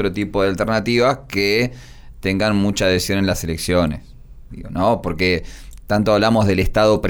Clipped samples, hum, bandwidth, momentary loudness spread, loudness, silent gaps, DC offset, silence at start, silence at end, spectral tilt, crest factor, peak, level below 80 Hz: under 0.1%; none; over 20 kHz; 8 LU; -18 LUFS; none; under 0.1%; 0 s; 0 s; -5.5 dB/octave; 14 dB; -4 dBFS; -34 dBFS